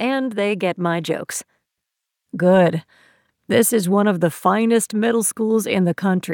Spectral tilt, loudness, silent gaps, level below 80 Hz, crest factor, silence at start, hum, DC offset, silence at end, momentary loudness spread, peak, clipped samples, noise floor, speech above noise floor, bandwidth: -5 dB/octave; -19 LUFS; none; -70 dBFS; 16 dB; 0 s; none; under 0.1%; 0 s; 8 LU; -4 dBFS; under 0.1%; -81 dBFS; 62 dB; 19 kHz